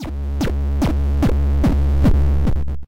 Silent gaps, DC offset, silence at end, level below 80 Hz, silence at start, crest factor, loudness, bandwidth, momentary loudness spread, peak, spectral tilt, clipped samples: none; under 0.1%; 0 s; -18 dBFS; 0 s; 10 dB; -19 LUFS; 8.8 kHz; 6 LU; -6 dBFS; -8 dB/octave; under 0.1%